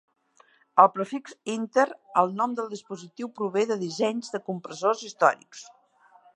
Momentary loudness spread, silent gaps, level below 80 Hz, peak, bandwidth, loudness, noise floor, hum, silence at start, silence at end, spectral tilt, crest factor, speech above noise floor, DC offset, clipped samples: 17 LU; none; -84 dBFS; -2 dBFS; 10.5 kHz; -26 LUFS; -61 dBFS; none; 0.75 s; 0.7 s; -4.5 dB/octave; 24 dB; 35 dB; under 0.1%; under 0.1%